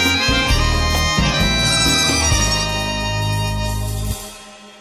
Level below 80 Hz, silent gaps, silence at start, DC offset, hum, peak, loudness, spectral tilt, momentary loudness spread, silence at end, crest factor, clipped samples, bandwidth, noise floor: -24 dBFS; none; 0 s; under 0.1%; none; -2 dBFS; -16 LUFS; -3 dB/octave; 11 LU; 0 s; 14 dB; under 0.1%; 16 kHz; -38 dBFS